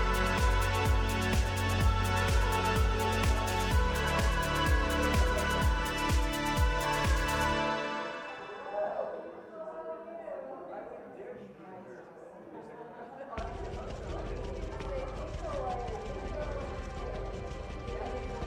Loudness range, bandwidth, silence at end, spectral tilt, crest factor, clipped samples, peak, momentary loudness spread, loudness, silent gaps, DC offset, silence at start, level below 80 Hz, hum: 15 LU; 17 kHz; 0 s; -5 dB/octave; 16 dB; under 0.1%; -16 dBFS; 17 LU; -32 LUFS; none; under 0.1%; 0 s; -36 dBFS; none